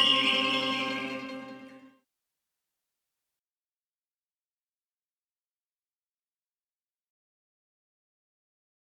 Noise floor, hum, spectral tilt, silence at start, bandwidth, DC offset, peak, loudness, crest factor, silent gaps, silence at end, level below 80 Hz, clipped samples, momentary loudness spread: under -90 dBFS; none; -2.5 dB/octave; 0 s; 15 kHz; under 0.1%; -10 dBFS; -27 LUFS; 26 dB; none; 7.15 s; -84 dBFS; under 0.1%; 22 LU